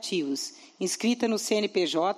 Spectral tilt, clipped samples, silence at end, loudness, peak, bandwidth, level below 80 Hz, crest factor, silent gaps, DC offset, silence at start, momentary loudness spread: -3 dB/octave; under 0.1%; 0 s; -28 LUFS; -12 dBFS; 15.5 kHz; -80 dBFS; 16 dB; none; under 0.1%; 0 s; 8 LU